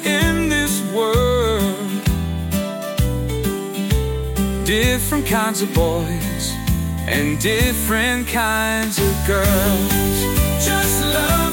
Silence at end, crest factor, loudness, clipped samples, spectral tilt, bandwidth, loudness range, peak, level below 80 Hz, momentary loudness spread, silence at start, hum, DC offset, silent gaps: 0 s; 14 dB; -18 LUFS; under 0.1%; -4.5 dB/octave; 17 kHz; 3 LU; -4 dBFS; -26 dBFS; 6 LU; 0 s; none; under 0.1%; none